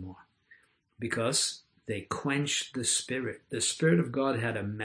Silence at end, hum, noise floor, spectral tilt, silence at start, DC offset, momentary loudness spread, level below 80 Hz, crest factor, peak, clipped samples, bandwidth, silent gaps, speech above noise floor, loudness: 0 s; none; -63 dBFS; -3.5 dB/octave; 0 s; under 0.1%; 12 LU; -68 dBFS; 20 dB; -12 dBFS; under 0.1%; 11 kHz; none; 32 dB; -30 LUFS